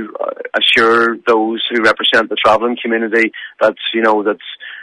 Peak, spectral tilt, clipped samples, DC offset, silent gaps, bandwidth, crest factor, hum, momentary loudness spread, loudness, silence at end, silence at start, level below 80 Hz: 0 dBFS; -3.5 dB/octave; under 0.1%; under 0.1%; none; 11.5 kHz; 14 dB; none; 10 LU; -13 LUFS; 0 s; 0 s; -56 dBFS